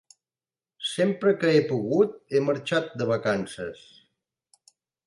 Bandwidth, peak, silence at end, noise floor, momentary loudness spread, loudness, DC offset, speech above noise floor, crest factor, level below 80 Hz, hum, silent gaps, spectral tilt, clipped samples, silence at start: 11.5 kHz; -10 dBFS; 1.3 s; under -90 dBFS; 11 LU; -25 LUFS; under 0.1%; over 66 dB; 18 dB; -68 dBFS; none; none; -6 dB/octave; under 0.1%; 0.8 s